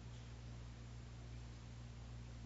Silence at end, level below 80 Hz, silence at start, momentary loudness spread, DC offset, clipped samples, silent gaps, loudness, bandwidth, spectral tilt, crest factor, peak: 0 s; -56 dBFS; 0 s; 1 LU; under 0.1%; under 0.1%; none; -55 LUFS; 7.6 kHz; -6 dB/octave; 10 dB; -42 dBFS